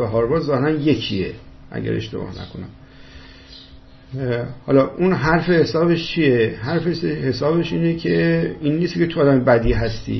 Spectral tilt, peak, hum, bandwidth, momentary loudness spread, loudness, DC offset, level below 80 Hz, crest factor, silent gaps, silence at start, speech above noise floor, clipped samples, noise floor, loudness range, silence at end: -7.5 dB/octave; -2 dBFS; none; 6.2 kHz; 13 LU; -19 LUFS; under 0.1%; -38 dBFS; 18 dB; none; 0 s; 24 dB; under 0.1%; -43 dBFS; 10 LU; 0 s